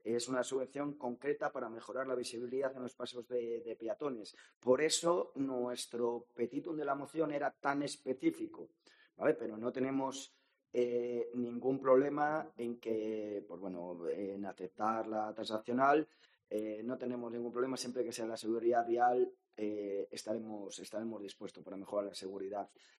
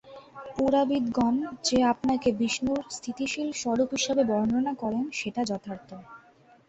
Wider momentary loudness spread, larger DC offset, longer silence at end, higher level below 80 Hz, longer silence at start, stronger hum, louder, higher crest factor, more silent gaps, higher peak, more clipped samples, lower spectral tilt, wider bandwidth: about the same, 13 LU vs 14 LU; neither; second, 0.35 s vs 0.5 s; second, -86 dBFS vs -58 dBFS; about the same, 0.05 s vs 0.05 s; neither; second, -38 LUFS vs -27 LUFS; first, 22 dB vs 16 dB; first, 4.56-4.61 s vs none; second, -16 dBFS vs -12 dBFS; neither; about the same, -4.5 dB/octave vs -4 dB/octave; first, 12.5 kHz vs 8.2 kHz